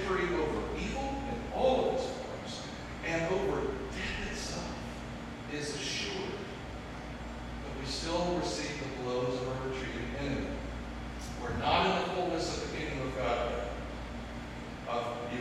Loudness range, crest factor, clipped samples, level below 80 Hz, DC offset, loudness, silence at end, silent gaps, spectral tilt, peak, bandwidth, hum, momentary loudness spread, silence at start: 4 LU; 22 dB; under 0.1%; -46 dBFS; under 0.1%; -35 LUFS; 0 s; none; -4.5 dB/octave; -14 dBFS; 13.5 kHz; none; 12 LU; 0 s